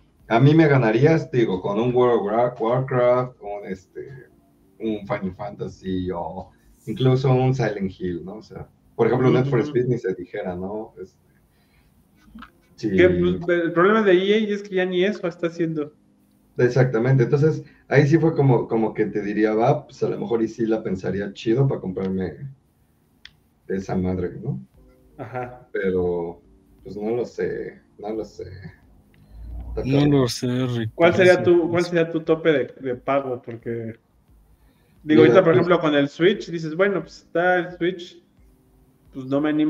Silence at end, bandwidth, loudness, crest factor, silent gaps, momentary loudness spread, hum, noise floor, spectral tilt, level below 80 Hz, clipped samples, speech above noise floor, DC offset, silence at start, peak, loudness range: 0 s; 11 kHz; -21 LUFS; 20 dB; none; 18 LU; none; -61 dBFS; -7.5 dB/octave; -50 dBFS; under 0.1%; 40 dB; under 0.1%; 0.3 s; 0 dBFS; 10 LU